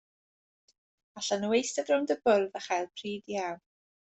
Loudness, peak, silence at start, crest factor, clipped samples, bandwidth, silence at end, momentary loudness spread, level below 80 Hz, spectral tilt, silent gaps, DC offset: -30 LUFS; -12 dBFS; 1.15 s; 20 dB; under 0.1%; 8.4 kHz; 0.6 s; 11 LU; -76 dBFS; -3.5 dB/octave; none; under 0.1%